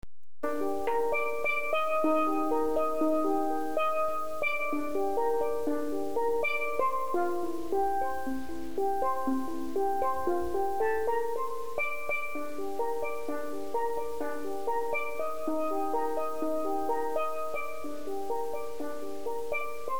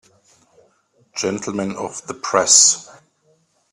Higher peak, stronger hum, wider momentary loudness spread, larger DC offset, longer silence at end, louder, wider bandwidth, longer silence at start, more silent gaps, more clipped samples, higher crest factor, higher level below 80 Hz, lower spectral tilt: second, -14 dBFS vs 0 dBFS; neither; second, 8 LU vs 18 LU; first, 2% vs under 0.1%; second, 0 s vs 0.9 s; second, -31 LUFS vs -16 LUFS; first, over 20 kHz vs 14.5 kHz; second, 0.45 s vs 1.15 s; neither; neither; second, 16 dB vs 22 dB; first, -58 dBFS vs -64 dBFS; first, -5 dB/octave vs -1 dB/octave